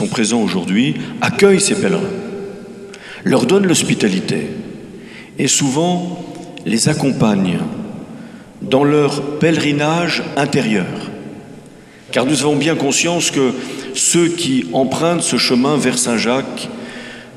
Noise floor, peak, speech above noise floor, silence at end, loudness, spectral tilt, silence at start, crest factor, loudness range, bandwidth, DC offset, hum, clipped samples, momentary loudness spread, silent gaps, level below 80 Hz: -39 dBFS; 0 dBFS; 25 dB; 0 s; -15 LUFS; -4 dB/octave; 0 s; 16 dB; 3 LU; 15 kHz; under 0.1%; none; under 0.1%; 18 LU; none; -56 dBFS